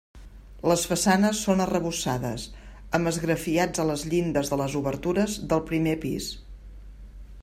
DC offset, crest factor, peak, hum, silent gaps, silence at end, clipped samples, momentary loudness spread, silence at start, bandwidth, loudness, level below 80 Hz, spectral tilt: under 0.1%; 20 dB; -8 dBFS; none; none; 0 s; under 0.1%; 9 LU; 0.15 s; 16 kHz; -26 LUFS; -46 dBFS; -5 dB/octave